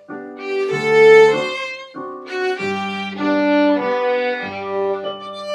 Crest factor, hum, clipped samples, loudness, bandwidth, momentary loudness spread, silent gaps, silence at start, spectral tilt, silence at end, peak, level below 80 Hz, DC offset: 16 dB; none; under 0.1%; -17 LUFS; 10 kHz; 18 LU; none; 0.1 s; -5 dB/octave; 0 s; 0 dBFS; -66 dBFS; under 0.1%